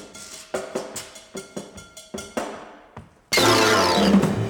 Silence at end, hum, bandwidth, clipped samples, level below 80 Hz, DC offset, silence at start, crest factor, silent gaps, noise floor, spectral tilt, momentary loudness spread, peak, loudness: 0 s; none; 19.5 kHz; under 0.1%; -50 dBFS; under 0.1%; 0 s; 18 dB; none; -46 dBFS; -4 dB/octave; 22 LU; -4 dBFS; -20 LUFS